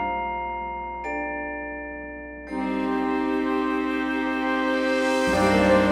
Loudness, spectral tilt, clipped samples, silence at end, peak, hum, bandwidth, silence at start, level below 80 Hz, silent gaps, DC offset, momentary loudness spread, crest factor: -25 LUFS; -5.5 dB/octave; under 0.1%; 0 s; -8 dBFS; none; 15 kHz; 0 s; -46 dBFS; none; under 0.1%; 13 LU; 16 dB